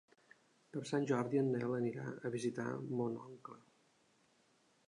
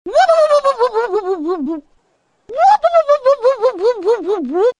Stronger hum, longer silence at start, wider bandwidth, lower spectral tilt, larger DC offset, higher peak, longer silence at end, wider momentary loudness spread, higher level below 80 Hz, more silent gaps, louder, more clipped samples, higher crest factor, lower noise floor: neither; first, 0.75 s vs 0.05 s; about the same, 11 kHz vs 10 kHz; first, -7 dB/octave vs -3 dB/octave; neither; second, -22 dBFS vs -2 dBFS; first, 1.3 s vs 0.1 s; first, 13 LU vs 9 LU; second, -84 dBFS vs -56 dBFS; neither; second, -39 LUFS vs -14 LUFS; neither; about the same, 18 dB vs 14 dB; first, -74 dBFS vs -61 dBFS